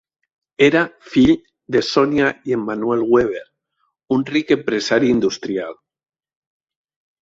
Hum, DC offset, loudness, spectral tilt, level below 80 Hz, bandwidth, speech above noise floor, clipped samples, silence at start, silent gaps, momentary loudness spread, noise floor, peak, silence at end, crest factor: none; under 0.1%; -18 LUFS; -5.5 dB/octave; -50 dBFS; 7.8 kHz; 53 dB; under 0.1%; 0.6 s; none; 9 LU; -70 dBFS; -2 dBFS; 1.5 s; 18 dB